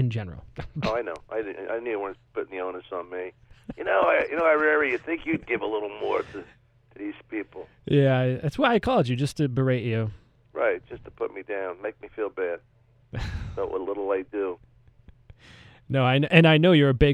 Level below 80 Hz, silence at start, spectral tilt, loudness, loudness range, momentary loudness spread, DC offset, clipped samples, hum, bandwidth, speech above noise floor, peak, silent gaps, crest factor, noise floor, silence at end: -46 dBFS; 0 s; -7.5 dB/octave; -25 LUFS; 8 LU; 18 LU; under 0.1%; under 0.1%; none; 11.5 kHz; 29 dB; -2 dBFS; none; 24 dB; -54 dBFS; 0 s